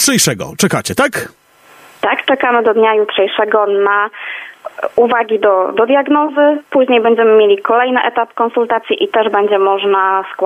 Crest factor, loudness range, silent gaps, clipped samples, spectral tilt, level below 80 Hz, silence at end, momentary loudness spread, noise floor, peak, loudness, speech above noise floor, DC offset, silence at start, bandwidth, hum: 12 dB; 2 LU; none; under 0.1%; -3.5 dB/octave; -58 dBFS; 0 s; 7 LU; -43 dBFS; 0 dBFS; -12 LUFS; 31 dB; under 0.1%; 0 s; 15.5 kHz; none